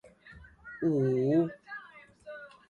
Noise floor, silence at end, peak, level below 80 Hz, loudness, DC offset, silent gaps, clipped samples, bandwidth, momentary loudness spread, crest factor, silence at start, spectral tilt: -54 dBFS; 0.2 s; -16 dBFS; -64 dBFS; -29 LUFS; under 0.1%; none; under 0.1%; 7 kHz; 22 LU; 16 dB; 0.25 s; -9.5 dB/octave